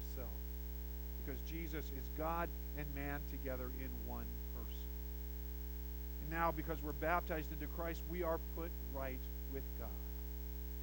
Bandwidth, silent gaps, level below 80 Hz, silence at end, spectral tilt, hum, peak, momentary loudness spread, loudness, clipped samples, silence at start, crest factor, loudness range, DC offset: 17 kHz; none; -46 dBFS; 0 s; -6.5 dB/octave; none; -22 dBFS; 7 LU; -44 LUFS; under 0.1%; 0 s; 22 dB; 4 LU; under 0.1%